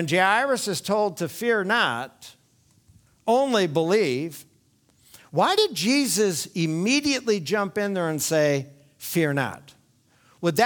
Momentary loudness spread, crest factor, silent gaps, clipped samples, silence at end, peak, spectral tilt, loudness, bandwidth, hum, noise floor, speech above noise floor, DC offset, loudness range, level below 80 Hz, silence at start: 10 LU; 18 dB; none; under 0.1%; 0 s; -6 dBFS; -4 dB/octave; -23 LUFS; 19.5 kHz; none; -62 dBFS; 39 dB; under 0.1%; 3 LU; -66 dBFS; 0 s